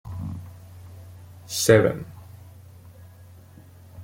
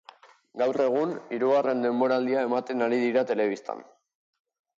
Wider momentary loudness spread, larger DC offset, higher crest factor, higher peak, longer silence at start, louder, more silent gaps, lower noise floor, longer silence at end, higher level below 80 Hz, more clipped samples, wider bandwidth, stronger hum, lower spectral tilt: first, 28 LU vs 9 LU; neither; first, 26 dB vs 14 dB; first, -2 dBFS vs -12 dBFS; second, 0.05 s vs 0.55 s; first, -22 LUFS vs -26 LUFS; neither; second, -48 dBFS vs -53 dBFS; second, 0 s vs 0.95 s; first, -54 dBFS vs -80 dBFS; neither; first, 16.5 kHz vs 7.6 kHz; neither; second, -4.5 dB/octave vs -6.5 dB/octave